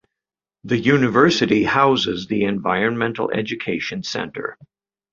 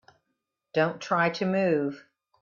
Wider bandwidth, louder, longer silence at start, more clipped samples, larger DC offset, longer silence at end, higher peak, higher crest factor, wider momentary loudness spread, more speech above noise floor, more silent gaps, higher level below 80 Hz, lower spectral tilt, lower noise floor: about the same, 7.6 kHz vs 7.2 kHz; first, -19 LUFS vs -27 LUFS; about the same, 0.65 s vs 0.75 s; neither; neither; first, 0.6 s vs 0.45 s; first, -2 dBFS vs -12 dBFS; about the same, 18 dB vs 16 dB; first, 11 LU vs 8 LU; first, 69 dB vs 55 dB; neither; first, -54 dBFS vs -72 dBFS; about the same, -5.5 dB/octave vs -6.5 dB/octave; first, -89 dBFS vs -81 dBFS